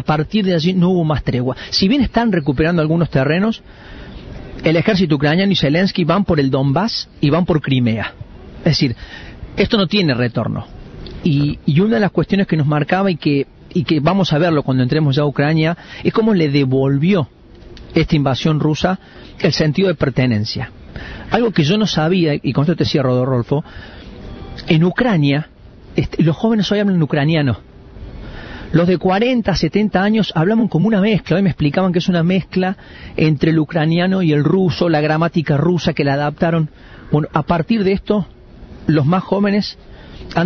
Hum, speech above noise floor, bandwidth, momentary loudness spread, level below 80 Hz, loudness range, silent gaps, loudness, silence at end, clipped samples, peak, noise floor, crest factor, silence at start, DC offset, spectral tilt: none; 22 dB; 6.8 kHz; 13 LU; -38 dBFS; 3 LU; none; -16 LUFS; 0 s; under 0.1%; -2 dBFS; -38 dBFS; 14 dB; 0 s; under 0.1%; -7.5 dB/octave